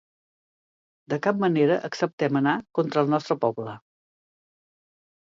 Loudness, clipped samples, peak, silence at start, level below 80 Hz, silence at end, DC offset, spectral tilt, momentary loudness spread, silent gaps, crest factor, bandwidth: -24 LUFS; under 0.1%; -8 dBFS; 1.1 s; -74 dBFS; 1.45 s; under 0.1%; -7 dB/octave; 10 LU; 2.13-2.18 s; 18 dB; 7.6 kHz